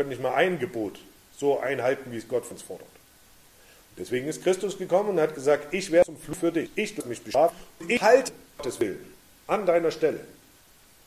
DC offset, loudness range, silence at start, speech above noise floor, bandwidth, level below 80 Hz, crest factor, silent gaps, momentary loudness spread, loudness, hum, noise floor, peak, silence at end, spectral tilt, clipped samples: under 0.1%; 6 LU; 0 s; 30 dB; 15 kHz; -62 dBFS; 22 dB; none; 14 LU; -26 LUFS; none; -56 dBFS; -6 dBFS; 0.75 s; -4.5 dB/octave; under 0.1%